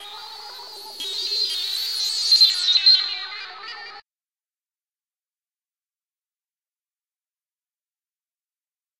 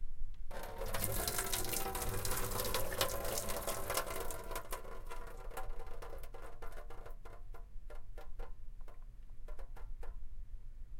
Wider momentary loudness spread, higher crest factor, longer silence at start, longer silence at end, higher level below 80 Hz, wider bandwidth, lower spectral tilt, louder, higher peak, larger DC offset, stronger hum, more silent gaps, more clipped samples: first, 22 LU vs 19 LU; about the same, 22 dB vs 24 dB; about the same, 0 s vs 0 s; first, 5 s vs 0 s; second, -78 dBFS vs -44 dBFS; about the same, 16 kHz vs 17 kHz; second, 4 dB/octave vs -2.5 dB/octave; first, -17 LUFS vs -40 LUFS; first, -4 dBFS vs -14 dBFS; neither; neither; neither; neither